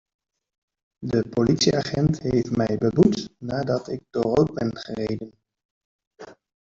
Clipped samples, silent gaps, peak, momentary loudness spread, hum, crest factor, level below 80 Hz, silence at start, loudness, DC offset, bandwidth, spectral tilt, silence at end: under 0.1%; 5.65-5.99 s, 6.07-6.11 s; -4 dBFS; 11 LU; none; 20 dB; -50 dBFS; 1 s; -23 LUFS; under 0.1%; 7.8 kHz; -6 dB/octave; 0.3 s